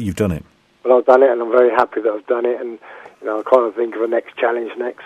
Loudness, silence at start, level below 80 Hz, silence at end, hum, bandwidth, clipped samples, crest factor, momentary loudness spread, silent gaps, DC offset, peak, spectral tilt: -17 LUFS; 0 s; -48 dBFS; 0 s; none; 13 kHz; under 0.1%; 16 dB; 14 LU; none; under 0.1%; 0 dBFS; -7 dB/octave